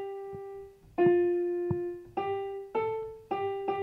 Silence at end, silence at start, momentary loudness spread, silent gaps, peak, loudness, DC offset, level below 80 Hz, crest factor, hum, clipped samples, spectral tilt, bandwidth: 0 s; 0 s; 16 LU; none; -14 dBFS; -31 LUFS; under 0.1%; -64 dBFS; 18 dB; none; under 0.1%; -9 dB/octave; 4 kHz